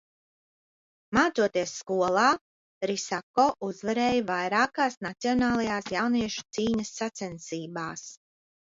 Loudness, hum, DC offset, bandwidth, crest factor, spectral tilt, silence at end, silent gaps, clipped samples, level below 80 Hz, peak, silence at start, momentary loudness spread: -27 LUFS; none; under 0.1%; 7.8 kHz; 20 dB; -4 dB/octave; 0.6 s; 2.41-2.81 s, 3.23-3.34 s, 4.97-5.01 s; under 0.1%; -60 dBFS; -8 dBFS; 1.1 s; 11 LU